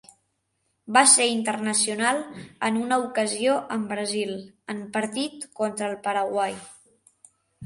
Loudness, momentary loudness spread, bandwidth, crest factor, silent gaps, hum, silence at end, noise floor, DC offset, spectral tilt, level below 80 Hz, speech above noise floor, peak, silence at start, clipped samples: -23 LUFS; 14 LU; 11.5 kHz; 22 dB; none; none; 0 s; -74 dBFS; under 0.1%; -2 dB/octave; -70 dBFS; 50 dB; -4 dBFS; 0.85 s; under 0.1%